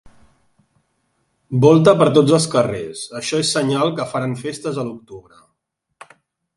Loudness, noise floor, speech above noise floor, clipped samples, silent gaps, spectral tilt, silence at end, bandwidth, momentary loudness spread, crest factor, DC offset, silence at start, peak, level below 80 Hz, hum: -17 LUFS; -74 dBFS; 58 dB; under 0.1%; none; -5.5 dB/octave; 1.35 s; 11.5 kHz; 15 LU; 18 dB; under 0.1%; 1.5 s; 0 dBFS; -58 dBFS; none